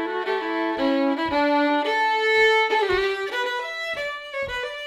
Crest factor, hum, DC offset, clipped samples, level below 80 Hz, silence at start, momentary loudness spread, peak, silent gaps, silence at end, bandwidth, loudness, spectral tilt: 14 dB; none; under 0.1%; under 0.1%; -54 dBFS; 0 s; 10 LU; -8 dBFS; none; 0 s; 15 kHz; -22 LUFS; -3.5 dB/octave